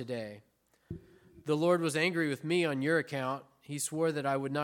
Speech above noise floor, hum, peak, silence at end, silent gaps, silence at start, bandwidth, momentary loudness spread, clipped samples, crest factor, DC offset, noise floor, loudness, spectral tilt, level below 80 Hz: 26 dB; none; -16 dBFS; 0 s; none; 0 s; 17.5 kHz; 18 LU; under 0.1%; 16 dB; under 0.1%; -57 dBFS; -32 LUFS; -5 dB/octave; -70 dBFS